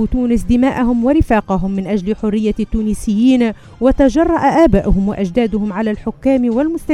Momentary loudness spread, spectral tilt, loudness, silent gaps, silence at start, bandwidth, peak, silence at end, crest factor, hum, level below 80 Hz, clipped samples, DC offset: 7 LU; -7.5 dB/octave; -15 LUFS; none; 0 s; 12.5 kHz; 0 dBFS; 0 s; 14 dB; none; -26 dBFS; under 0.1%; under 0.1%